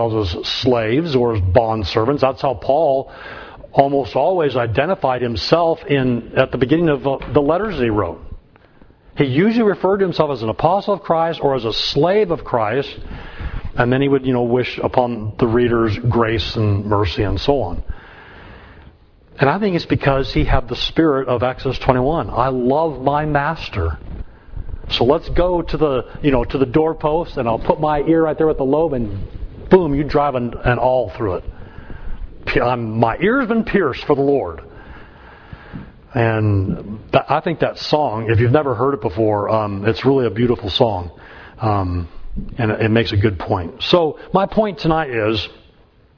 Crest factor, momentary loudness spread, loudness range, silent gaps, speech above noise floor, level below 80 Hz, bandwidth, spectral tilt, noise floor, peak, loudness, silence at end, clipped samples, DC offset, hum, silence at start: 18 dB; 13 LU; 3 LU; none; 33 dB; -32 dBFS; 5.4 kHz; -7.5 dB/octave; -50 dBFS; 0 dBFS; -18 LUFS; 0.65 s; under 0.1%; under 0.1%; none; 0 s